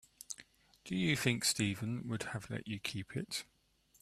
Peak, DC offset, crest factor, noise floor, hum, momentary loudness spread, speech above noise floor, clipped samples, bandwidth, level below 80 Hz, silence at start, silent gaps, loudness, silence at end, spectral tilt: -14 dBFS; under 0.1%; 24 dB; -62 dBFS; none; 16 LU; 25 dB; under 0.1%; 14 kHz; -68 dBFS; 0.3 s; none; -37 LUFS; 0.6 s; -3.5 dB/octave